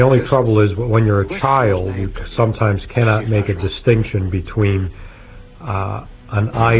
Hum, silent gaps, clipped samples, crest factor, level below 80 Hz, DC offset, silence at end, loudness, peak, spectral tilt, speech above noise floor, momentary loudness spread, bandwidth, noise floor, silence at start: none; none; under 0.1%; 16 dB; -32 dBFS; under 0.1%; 0 s; -17 LUFS; 0 dBFS; -11.5 dB/octave; 22 dB; 9 LU; 4 kHz; -38 dBFS; 0 s